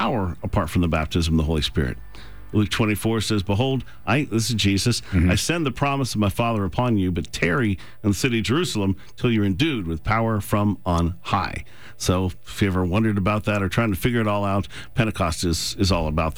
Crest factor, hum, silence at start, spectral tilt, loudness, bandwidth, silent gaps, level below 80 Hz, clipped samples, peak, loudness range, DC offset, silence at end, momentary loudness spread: 14 dB; none; 0 s; -5.5 dB/octave; -23 LUFS; over 20 kHz; none; -36 dBFS; under 0.1%; -8 dBFS; 2 LU; 1%; 0 s; 5 LU